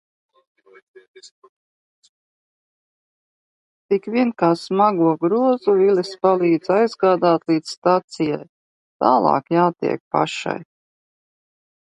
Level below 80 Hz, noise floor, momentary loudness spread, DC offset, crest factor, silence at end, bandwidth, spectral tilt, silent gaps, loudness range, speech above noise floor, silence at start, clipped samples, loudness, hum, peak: -70 dBFS; under -90 dBFS; 8 LU; under 0.1%; 20 dB; 1.25 s; 11.5 kHz; -6.5 dB/octave; 1.31-1.42 s, 1.49-2.03 s, 2.09-3.89 s, 7.77-7.82 s, 8.04-8.08 s, 8.49-9.00 s, 10.00-10.11 s; 7 LU; over 71 dB; 1.25 s; under 0.1%; -19 LUFS; none; -2 dBFS